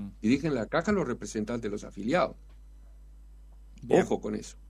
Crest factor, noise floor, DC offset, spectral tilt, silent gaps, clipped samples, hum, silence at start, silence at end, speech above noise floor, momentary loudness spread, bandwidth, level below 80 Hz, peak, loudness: 22 dB; -50 dBFS; under 0.1%; -6 dB/octave; none; under 0.1%; none; 0 s; 0 s; 21 dB; 10 LU; 12 kHz; -50 dBFS; -8 dBFS; -29 LUFS